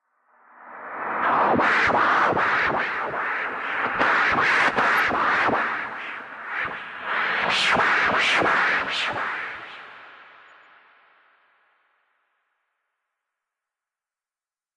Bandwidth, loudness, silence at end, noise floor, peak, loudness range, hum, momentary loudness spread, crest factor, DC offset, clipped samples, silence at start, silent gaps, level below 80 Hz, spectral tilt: 12 kHz; -21 LUFS; 4.55 s; under -90 dBFS; -6 dBFS; 6 LU; none; 14 LU; 20 dB; under 0.1%; under 0.1%; 0.6 s; none; -60 dBFS; -3 dB/octave